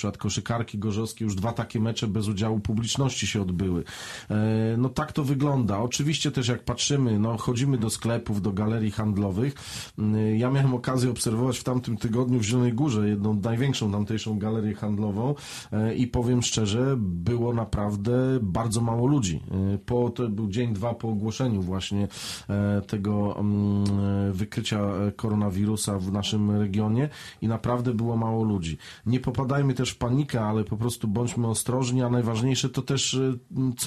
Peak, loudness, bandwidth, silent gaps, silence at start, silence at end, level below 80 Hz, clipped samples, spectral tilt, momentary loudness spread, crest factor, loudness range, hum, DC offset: -12 dBFS; -26 LUFS; 13 kHz; none; 0 s; 0 s; -50 dBFS; under 0.1%; -6 dB/octave; 5 LU; 14 dB; 2 LU; none; under 0.1%